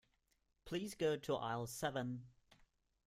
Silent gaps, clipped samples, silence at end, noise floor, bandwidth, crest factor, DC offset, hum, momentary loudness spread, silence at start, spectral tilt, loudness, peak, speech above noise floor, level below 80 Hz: none; under 0.1%; 0.8 s; -81 dBFS; 16 kHz; 18 dB; under 0.1%; none; 7 LU; 0.65 s; -5 dB/octave; -42 LUFS; -26 dBFS; 39 dB; -72 dBFS